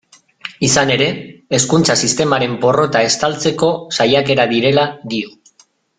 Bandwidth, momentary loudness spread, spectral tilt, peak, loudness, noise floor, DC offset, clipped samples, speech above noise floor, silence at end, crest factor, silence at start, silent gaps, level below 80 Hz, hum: 9.8 kHz; 11 LU; -3.5 dB/octave; 0 dBFS; -14 LUFS; -53 dBFS; under 0.1%; under 0.1%; 39 dB; 0.7 s; 16 dB; 0.45 s; none; -52 dBFS; none